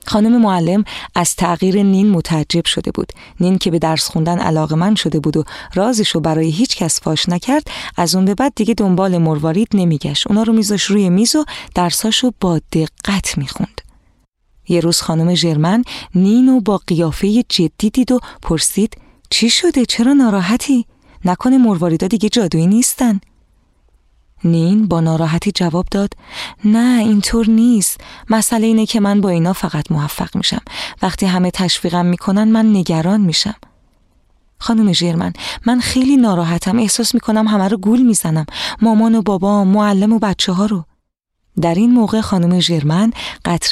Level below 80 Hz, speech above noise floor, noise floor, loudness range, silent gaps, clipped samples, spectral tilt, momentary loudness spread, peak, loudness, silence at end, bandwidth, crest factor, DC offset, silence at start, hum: -40 dBFS; 54 dB; -68 dBFS; 3 LU; none; under 0.1%; -5 dB/octave; 8 LU; 0 dBFS; -14 LUFS; 0 s; 15 kHz; 14 dB; under 0.1%; 0.05 s; none